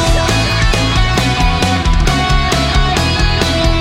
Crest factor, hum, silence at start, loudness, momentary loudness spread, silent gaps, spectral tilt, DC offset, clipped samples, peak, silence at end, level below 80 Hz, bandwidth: 12 dB; none; 0 s; -13 LUFS; 1 LU; none; -4.5 dB/octave; under 0.1%; under 0.1%; 0 dBFS; 0 s; -16 dBFS; 15.5 kHz